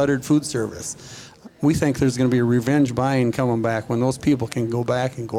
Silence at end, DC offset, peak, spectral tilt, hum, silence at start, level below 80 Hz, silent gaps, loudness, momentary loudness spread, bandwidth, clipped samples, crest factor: 0 s; under 0.1%; -6 dBFS; -6.5 dB/octave; none; 0 s; -48 dBFS; none; -21 LUFS; 10 LU; 16 kHz; under 0.1%; 14 dB